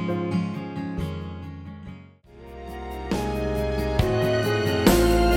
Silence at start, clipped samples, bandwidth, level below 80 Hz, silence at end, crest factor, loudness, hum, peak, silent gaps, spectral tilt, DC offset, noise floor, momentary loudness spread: 0 s; under 0.1%; 17 kHz; -34 dBFS; 0 s; 18 dB; -24 LUFS; none; -6 dBFS; none; -6 dB/octave; under 0.1%; -46 dBFS; 20 LU